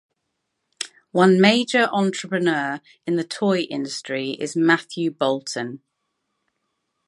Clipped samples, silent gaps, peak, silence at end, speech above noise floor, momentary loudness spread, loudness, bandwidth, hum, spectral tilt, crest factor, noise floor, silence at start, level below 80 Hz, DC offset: under 0.1%; none; 0 dBFS; 1.3 s; 56 dB; 14 LU; -21 LUFS; 11.5 kHz; none; -5 dB/octave; 22 dB; -77 dBFS; 0.8 s; -74 dBFS; under 0.1%